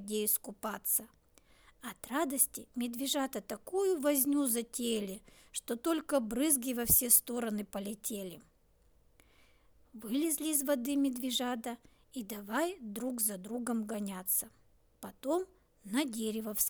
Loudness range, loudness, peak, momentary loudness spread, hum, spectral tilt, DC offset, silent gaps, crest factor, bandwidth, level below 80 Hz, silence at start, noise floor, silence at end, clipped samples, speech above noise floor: 6 LU; -33 LUFS; -12 dBFS; 14 LU; none; -2.5 dB/octave; under 0.1%; none; 22 dB; over 20 kHz; -62 dBFS; 0 s; -67 dBFS; 0 s; under 0.1%; 33 dB